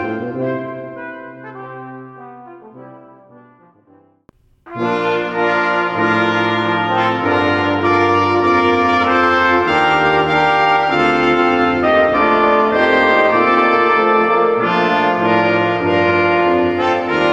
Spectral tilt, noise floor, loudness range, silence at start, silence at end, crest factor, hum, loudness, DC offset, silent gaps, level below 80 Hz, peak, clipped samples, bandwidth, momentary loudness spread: -6 dB/octave; -52 dBFS; 13 LU; 0 s; 0 s; 14 dB; none; -14 LUFS; under 0.1%; none; -48 dBFS; -2 dBFS; under 0.1%; 8.2 kHz; 14 LU